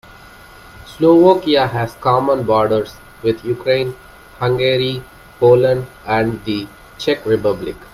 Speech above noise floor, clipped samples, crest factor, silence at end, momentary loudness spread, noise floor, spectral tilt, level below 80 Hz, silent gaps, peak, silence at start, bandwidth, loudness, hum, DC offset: 25 dB; under 0.1%; 16 dB; 0.1 s; 12 LU; -40 dBFS; -7 dB/octave; -46 dBFS; none; 0 dBFS; 0.75 s; 15.5 kHz; -16 LUFS; none; under 0.1%